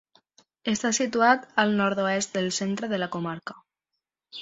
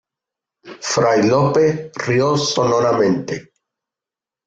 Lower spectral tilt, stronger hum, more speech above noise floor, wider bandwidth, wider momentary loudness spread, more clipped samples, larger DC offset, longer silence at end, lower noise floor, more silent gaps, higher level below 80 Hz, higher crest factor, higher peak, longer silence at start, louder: second, -3.5 dB/octave vs -5 dB/octave; neither; second, 59 dB vs 72 dB; about the same, 8.2 kHz vs 9 kHz; about the same, 13 LU vs 11 LU; neither; neither; second, 0 s vs 1.05 s; second, -84 dBFS vs -89 dBFS; neither; second, -70 dBFS vs -56 dBFS; first, 22 dB vs 14 dB; about the same, -6 dBFS vs -4 dBFS; about the same, 0.65 s vs 0.65 s; second, -25 LUFS vs -16 LUFS